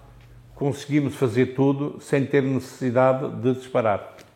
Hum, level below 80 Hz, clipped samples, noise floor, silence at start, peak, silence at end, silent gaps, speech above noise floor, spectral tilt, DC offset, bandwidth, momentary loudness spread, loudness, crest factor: none; -58 dBFS; under 0.1%; -47 dBFS; 0.3 s; -6 dBFS; 0.15 s; none; 25 dB; -7.5 dB/octave; under 0.1%; 15.5 kHz; 7 LU; -23 LUFS; 18 dB